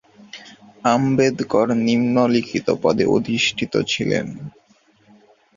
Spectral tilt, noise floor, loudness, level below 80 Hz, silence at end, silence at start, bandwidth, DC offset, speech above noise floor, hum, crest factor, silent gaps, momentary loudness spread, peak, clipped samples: -5 dB/octave; -56 dBFS; -19 LUFS; -54 dBFS; 1.1 s; 0.35 s; 7.4 kHz; under 0.1%; 37 dB; none; 18 dB; none; 21 LU; -2 dBFS; under 0.1%